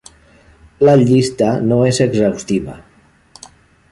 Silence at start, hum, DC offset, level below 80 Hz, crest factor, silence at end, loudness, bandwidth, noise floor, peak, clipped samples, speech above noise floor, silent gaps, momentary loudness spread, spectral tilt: 0.8 s; none; under 0.1%; -46 dBFS; 14 dB; 1.1 s; -14 LUFS; 11.5 kHz; -51 dBFS; -2 dBFS; under 0.1%; 38 dB; none; 10 LU; -6.5 dB/octave